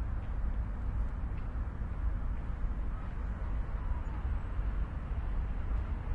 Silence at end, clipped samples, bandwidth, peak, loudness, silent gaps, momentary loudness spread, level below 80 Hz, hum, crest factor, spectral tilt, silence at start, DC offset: 0 s; under 0.1%; 3.8 kHz; -22 dBFS; -39 LUFS; none; 2 LU; -34 dBFS; none; 12 dB; -9 dB/octave; 0 s; under 0.1%